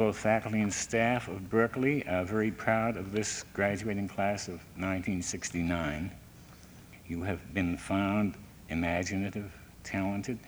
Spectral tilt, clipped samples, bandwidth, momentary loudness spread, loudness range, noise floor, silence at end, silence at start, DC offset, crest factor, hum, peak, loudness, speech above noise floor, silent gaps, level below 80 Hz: -5 dB/octave; under 0.1%; over 20 kHz; 12 LU; 5 LU; -52 dBFS; 0 s; 0 s; under 0.1%; 20 dB; none; -12 dBFS; -32 LUFS; 21 dB; none; -54 dBFS